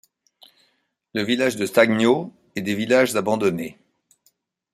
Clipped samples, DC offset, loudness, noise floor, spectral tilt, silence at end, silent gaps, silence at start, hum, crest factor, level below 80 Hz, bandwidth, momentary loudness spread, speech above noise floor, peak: under 0.1%; under 0.1%; -21 LUFS; -69 dBFS; -4.5 dB/octave; 1 s; none; 1.15 s; none; 20 dB; -66 dBFS; 15 kHz; 13 LU; 49 dB; -2 dBFS